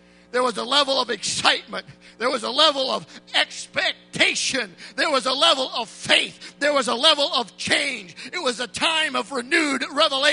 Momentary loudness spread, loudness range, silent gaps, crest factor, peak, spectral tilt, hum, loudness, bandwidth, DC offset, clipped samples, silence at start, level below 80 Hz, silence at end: 10 LU; 2 LU; none; 22 dB; 0 dBFS; -1 dB/octave; none; -21 LUFS; 11 kHz; under 0.1%; under 0.1%; 0.35 s; -66 dBFS; 0 s